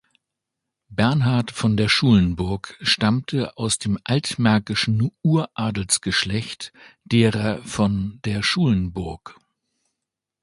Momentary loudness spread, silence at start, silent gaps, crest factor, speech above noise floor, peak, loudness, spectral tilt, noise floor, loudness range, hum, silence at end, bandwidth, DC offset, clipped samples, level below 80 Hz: 9 LU; 0.9 s; none; 20 dB; 63 dB; -2 dBFS; -21 LUFS; -5 dB/octave; -84 dBFS; 3 LU; none; 1.1 s; 11.5 kHz; under 0.1%; under 0.1%; -44 dBFS